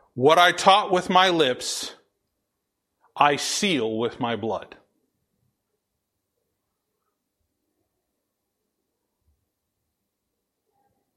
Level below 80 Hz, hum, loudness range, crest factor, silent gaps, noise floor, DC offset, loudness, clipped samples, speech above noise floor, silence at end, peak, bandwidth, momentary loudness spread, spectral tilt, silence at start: -68 dBFS; none; 14 LU; 24 dB; none; -80 dBFS; under 0.1%; -21 LUFS; under 0.1%; 59 dB; 6.5 s; -2 dBFS; 14.5 kHz; 13 LU; -3 dB/octave; 0.15 s